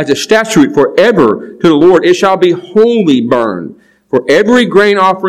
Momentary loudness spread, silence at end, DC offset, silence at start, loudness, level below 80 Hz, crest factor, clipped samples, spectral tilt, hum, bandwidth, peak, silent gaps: 6 LU; 0 s; 0.4%; 0 s; -9 LUFS; -48 dBFS; 8 dB; 4%; -5 dB/octave; none; 14.5 kHz; 0 dBFS; none